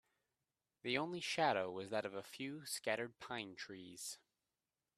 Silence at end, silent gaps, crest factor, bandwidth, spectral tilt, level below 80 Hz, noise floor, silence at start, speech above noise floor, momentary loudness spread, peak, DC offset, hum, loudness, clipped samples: 0.8 s; none; 22 dB; 15.5 kHz; -3 dB/octave; -84 dBFS; under -90 dBFS; 0.85 s; over 47 dB; 12 LU; -22 dBFS; under 0.1%; none; -42 LUFS; under 0.1%